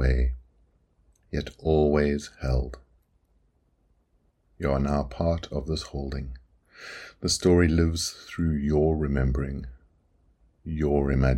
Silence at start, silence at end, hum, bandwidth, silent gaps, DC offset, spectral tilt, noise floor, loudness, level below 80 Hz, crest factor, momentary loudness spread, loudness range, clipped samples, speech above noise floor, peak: 0 s; 0 s; none; 13 kHz; none; under 0.1%; -6 dB/octave; -67 dBFS; -26 LUFS; -34 dBFS; 20 dB; 17 LU; 6 LU; under 0.1%; 43 dB; -6 dBFS